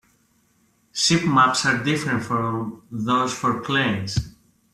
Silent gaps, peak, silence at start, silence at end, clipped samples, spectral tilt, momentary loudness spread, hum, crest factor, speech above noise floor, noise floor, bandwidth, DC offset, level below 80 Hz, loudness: none; -6 dBFS; 0.95 s; 0.45 s; under 0.1%; -4 dB/octave; 13 LU; none; 18 dB; 41 dB; -63 dBFS; 14 kHz; under 0.1%; -48 dBFS; -21 LUFS